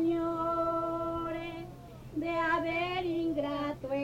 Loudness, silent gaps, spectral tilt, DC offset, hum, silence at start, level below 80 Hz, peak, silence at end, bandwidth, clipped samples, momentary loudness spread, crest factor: -33 LUFS; none; -6.5 dB/octave; under 0.1%; none; 0 s; -56 dBFS; -20 dBFS; 0 s; 15.5 kHz; under 0.1%; 11 LU; 12 dB